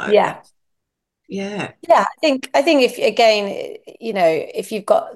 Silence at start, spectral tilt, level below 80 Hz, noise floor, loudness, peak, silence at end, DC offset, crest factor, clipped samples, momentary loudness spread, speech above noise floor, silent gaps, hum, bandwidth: 0 s; -4 dB/octave; -70 dBFS; -78 dBFS; -17 LUFS; -2 dBFS; 0 s; under 0.1%; 16 dB; under 0.1%; 15 LU; 60 dB; none; none; 12.5 kHz